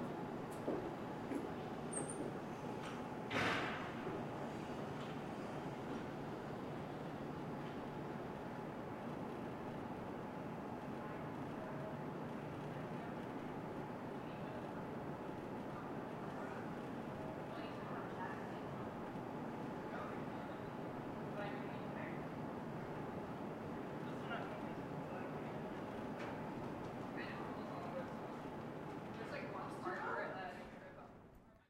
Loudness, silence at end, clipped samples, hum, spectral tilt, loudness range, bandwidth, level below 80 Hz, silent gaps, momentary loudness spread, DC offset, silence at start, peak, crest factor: -46 LUFS; 0.05 s; under 0.1%; none; -6 dB/octave; 4 LU; 16 kHz; -70 dBFS; none; 4 LU; under 0.1%; 0 s; -26 dBFS; 20 dB